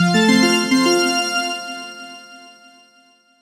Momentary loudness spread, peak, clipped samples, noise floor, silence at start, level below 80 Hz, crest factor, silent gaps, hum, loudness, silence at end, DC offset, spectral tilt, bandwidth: 21 LU; -2 dBFS; under 0.1%; -54 dBFS; 0 s; -64 dBFS; 16 dB; none; none; -16 LUFS; 1.05 s; under 0.1%; -4 dB/octave; 16 kHz